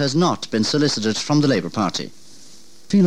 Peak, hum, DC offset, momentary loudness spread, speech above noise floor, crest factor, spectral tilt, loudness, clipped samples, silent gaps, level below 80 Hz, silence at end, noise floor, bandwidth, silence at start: -6 dBFS; none; 1%; 6 LU; 28 dB; 14 dB; -5 dB/octave; -20 LUFS; under 0.1%; none; -60 dBFS; 0 s; -48 dBFS; 13 kHz; 0 s